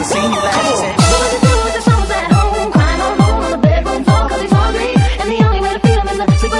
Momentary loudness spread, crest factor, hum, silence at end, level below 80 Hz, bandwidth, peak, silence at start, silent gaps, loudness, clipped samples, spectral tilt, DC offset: 3 LU; 12 dB; none; 0 s; -20 dBFS; 11.5 kHz; 0 dBFS; 0 s; none; -13 LUFS; under 0.1%; -5.5 dB/octave; under 0.1%